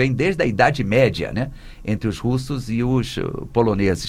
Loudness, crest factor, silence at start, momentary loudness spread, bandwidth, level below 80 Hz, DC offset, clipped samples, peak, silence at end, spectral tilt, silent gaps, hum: -21 LUFS; 18 dB; 0 s; 10 LU; 14.5 kHz; -38 dBFS; under 0.1%; under 0.1%; -2 dBFS; 0 s; -6.5 dB/octave; none; none